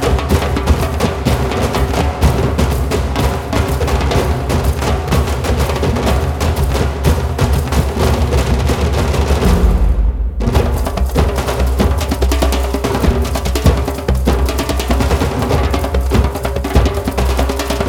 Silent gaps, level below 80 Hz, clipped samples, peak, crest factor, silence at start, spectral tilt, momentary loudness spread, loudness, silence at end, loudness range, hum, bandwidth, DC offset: none; -16 dBFS; under 0.1%; 0 dBFS; 14 dB; 0 s; -6 dB/octave; 3 LU; -15 LUFS; 0 s; 1 LU; none; 17 kHz; under 0.1%